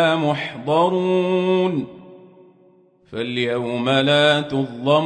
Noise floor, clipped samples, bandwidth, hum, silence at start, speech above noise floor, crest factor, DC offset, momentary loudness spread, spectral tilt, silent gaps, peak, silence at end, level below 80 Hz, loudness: -54 dBFS; under 0.1%; 9.6 kHz; none; 0 s; 35 dB; 16 dB; under 0.1%; 11 LU; -6 dB/octave; none; -4 dBFS; 0 s; -62 dBFS; -19 LUFS